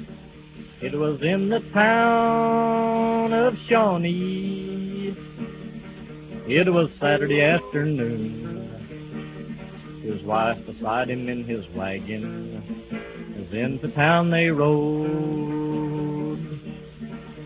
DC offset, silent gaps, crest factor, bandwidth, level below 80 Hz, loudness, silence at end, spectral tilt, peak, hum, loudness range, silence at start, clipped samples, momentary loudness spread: under 0.1%; none; 20 dB; 4 kHz; -52 dBFS; -23 LUFS; 0 s; -10.5 dB/octave; -4 dBFS; none; 8 LU; 0 s; under 0.1%; 18 LU